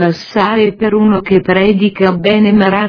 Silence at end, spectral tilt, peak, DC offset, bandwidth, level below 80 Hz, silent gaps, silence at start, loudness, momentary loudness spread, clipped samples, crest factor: 0 s; -8 dB/octave; 0 dBFS; under 0.1%; 5.4 kHz; -42 dBFS; none; 0 s; -11 LUFS; 3 LU; 0.2%; 10 dB